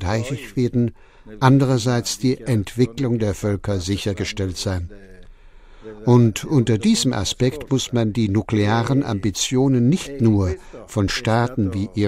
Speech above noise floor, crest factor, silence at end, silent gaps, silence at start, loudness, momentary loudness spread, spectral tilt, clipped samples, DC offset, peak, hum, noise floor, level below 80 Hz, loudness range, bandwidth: 24 dB; 18 dB; 0 s; none; 0 s; -20 LUFS; 8 LU; -6 dB/octave; under 0.1%; under 0.1%; -2 dBFS; none; -44 dBFS; -42 dBFS; 4 LU; 15 kHz